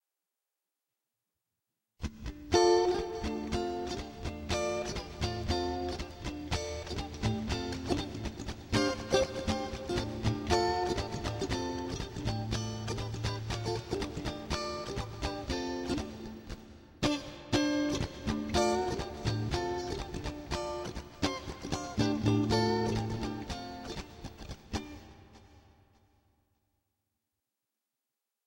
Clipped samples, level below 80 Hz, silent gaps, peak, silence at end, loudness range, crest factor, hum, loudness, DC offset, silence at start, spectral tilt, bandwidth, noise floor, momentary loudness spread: under 0.1%; -46 dBFS; none; -12 dBFS; 2.85 s; 5 LU; 24 dB; none; -34 LUFS; under 0.1%; 2 s; -5 dB/octave; 16.5 kHz; -89 dBFS; 12 LU